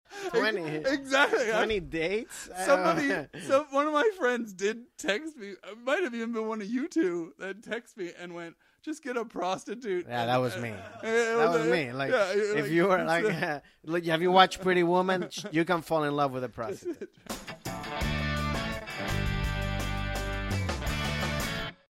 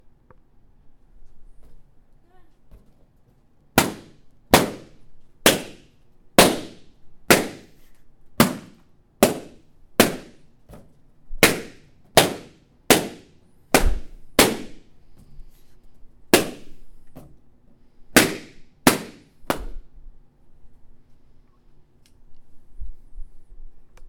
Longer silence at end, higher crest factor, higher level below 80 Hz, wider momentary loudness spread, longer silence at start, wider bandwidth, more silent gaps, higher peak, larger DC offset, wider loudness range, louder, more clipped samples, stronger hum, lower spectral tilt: first, 0.2 s vs 0 s; about the same, 24 dB vs 26 dB; second, -44 dBFS vs -38 dBFS; second, 14 LU vs 23 LU; second, 0.1 s vs 0.85 s; second, 16 kHz vs 19 kHz; neither; second, -6 dBFS vs 0 dBFS; neither; about the same, 7 LU vs 7 LU; second, -29 LUFS vs -20 LUFS; neither; neither; first, -5 dB/octave vs -3 dB/octave